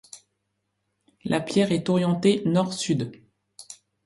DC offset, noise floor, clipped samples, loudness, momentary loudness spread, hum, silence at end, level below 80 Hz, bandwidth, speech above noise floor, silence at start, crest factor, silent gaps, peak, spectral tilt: under 0.1%; -77 dBFS; under 0.1%; -24 LUFS; 20 LU; none; 0.3 s; -64 dBFS; 11.5 kHz; 54 dB; 0.15 s; 18 dB; none; -8 dBFS; -6 dB/octave